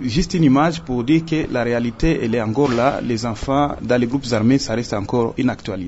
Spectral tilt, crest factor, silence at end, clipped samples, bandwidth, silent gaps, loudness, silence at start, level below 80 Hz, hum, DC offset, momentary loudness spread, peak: -6.5 dB/octave; 14 dB; 0 s; under 0.1%; 8 kHz; none; -19 LUFS; 0 s; -34 dBFS; none; under 0.1%; 6 LU; -4 dBFS